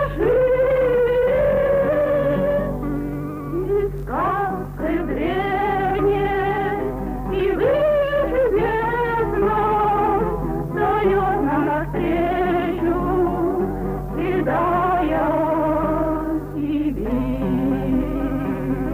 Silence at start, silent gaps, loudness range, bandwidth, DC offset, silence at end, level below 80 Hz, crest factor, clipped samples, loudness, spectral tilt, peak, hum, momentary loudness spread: 0 s; none; 3 LU; 16 kHz; under 0.1%; 0 s; -34 dBFS; 12 dB; under 0.1%; -20 LUFS; -8.5 dB/octave; -6 dBFS; none; 7 LU